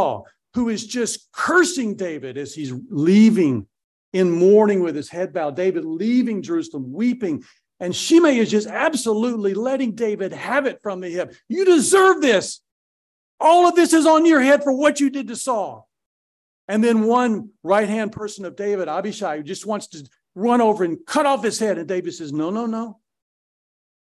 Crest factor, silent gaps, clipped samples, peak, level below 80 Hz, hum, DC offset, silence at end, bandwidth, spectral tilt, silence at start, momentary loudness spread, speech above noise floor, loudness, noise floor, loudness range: 16 dB; 3.84-4.12 s, 12.72-13.38 s, 16.06-16.68 s; under 0.1%; -4 dBFS; -62 dBFS; none; under 0.1%; 1.15 s; 12.5 kHz; -4.5 dB/octave; 0 s; 15 LU; over 71 dB; -19 LUFS; under -90 dBFS; 6 LU